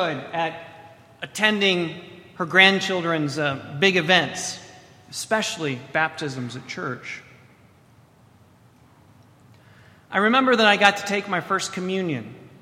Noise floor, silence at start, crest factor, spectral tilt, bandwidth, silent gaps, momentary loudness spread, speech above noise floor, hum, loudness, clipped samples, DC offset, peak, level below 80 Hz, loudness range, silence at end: -54 dBFS; 0 s; 24 dB; -3.5 dB/octave; 16 kHz; none; 18 LU; 32 dB; none; -21 LUFS; under 0.1%; under 0.1%; 0 dBFS; -66 dBFS; 14 LU; 0.15 s